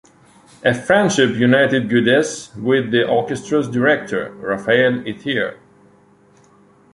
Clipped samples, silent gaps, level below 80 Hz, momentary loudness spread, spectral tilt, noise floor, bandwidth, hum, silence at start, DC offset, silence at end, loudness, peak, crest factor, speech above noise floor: under 0.1%; none; -56 dBFS; 10 LU; -5 dB/octave; -51 dBFS; 11.5 kHz; 50 Hz at -45 dBFS; 0.65 s; under 0.1%; 1.4 s; -17 LUFS; -2 dBFS; 16 dB; 35 dB